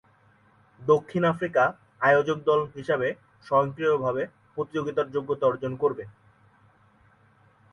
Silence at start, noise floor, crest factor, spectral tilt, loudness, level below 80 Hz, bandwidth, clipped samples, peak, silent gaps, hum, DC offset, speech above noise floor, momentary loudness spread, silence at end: 0.8 s; -60 dBFS; 18 dB; -7 dB/octave; -26 LUFS; -64 dBFS; 6.8 kHz; under 0.1%; -8 dBFS; none; none; under 0.1%; 36 dB; 11 LU; 1.65 s